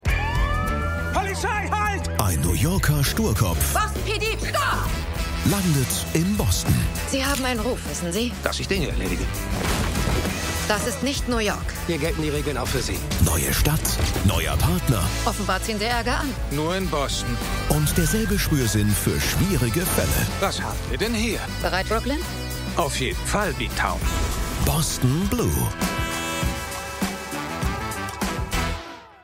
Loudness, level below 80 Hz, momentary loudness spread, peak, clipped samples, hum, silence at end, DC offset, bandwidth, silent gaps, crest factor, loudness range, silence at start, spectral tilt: -23 LUFS; -30 dBFS; 6 LU; -2 dBFS; under 0.1%; none; 0.1 s; under 0.1%; 16.5 kHz; none; 22 dB; 3 LU; 0.05 s; -4.5 dB/octave